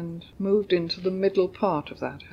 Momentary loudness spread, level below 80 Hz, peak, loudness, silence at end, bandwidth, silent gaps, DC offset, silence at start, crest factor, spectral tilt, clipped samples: 11 LU; -58 dBFS; -10 dBFS; -26 LUFS; 0 s; 6.8 kHz; none; under 0.1%; 0 s; 16 dB; -7.5 dB/octave; under 0.1%